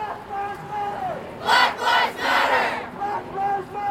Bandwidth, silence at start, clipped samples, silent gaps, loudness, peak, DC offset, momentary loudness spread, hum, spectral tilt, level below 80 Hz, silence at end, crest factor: 16 kHz; 0 s; under 0.1%; none; -22 LUFS; -4 dBFS; under 0.1%; 12 LU; none; -2.5 dB/octave; -56 dBFS; 0 s; 20 dB